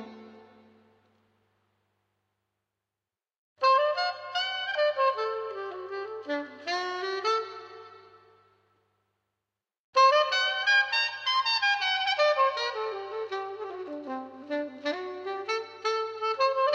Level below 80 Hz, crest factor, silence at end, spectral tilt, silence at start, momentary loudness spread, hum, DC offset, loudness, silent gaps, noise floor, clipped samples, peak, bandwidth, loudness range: -88 dBFS; 18 dB; 0 s; -1 dB/octave; 0 s; 15 LU; none; under 0.1%; -27 LUFS; 3.38-3.56 s, 9.79-9.93 s; under -90 dBFS; under 0.1%; -12 dBFS; 8.4 kHz; 10 LU